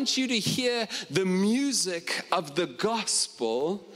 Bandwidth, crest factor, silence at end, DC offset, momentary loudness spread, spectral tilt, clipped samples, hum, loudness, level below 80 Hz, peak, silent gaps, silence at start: 16 kHz; 18 dB; 0 s; under 0.1%; 4 LU; -3 dB/octave; under 0.1%; none; -27 LUFS; -70 dBFS; -10 dBFS; none; 0 s